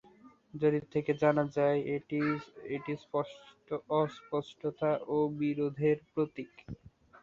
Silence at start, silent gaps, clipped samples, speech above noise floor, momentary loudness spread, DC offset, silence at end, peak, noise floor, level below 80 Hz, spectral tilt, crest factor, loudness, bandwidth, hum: 0.25 s; none; under 0.1%; 27 dB; 13 LU; under 0.1%; 0.5 s; -14 dBFS; -59 dBFS; -68 dBFS; -8.5 dB/octave; 20 dB; -33 LUFS; 7.4 kHz; none